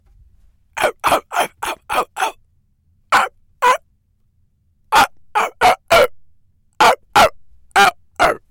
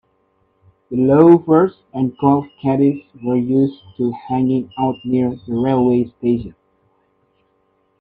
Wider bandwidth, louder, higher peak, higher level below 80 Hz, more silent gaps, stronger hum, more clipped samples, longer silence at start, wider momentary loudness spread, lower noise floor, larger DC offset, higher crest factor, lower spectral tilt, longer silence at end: first, 17 kHz vs 4.4 kHz; about the same, -16 LUFS vs -17 LUFS; second, -4 dBFS vs 0 dBFS; first, -46 dBFS vs -52 dBFS; neither; neither; neither; second, 0.75 s vs 0.9 s; second, 9 LU vs 12 LU; about the same, -60 dBFS vs -63 dBFS; neither; about the same, 14 dB vs 18 dB; second, -2 dB/octave vs -11 dB/octave; second, 0.15 s vs 1.5 s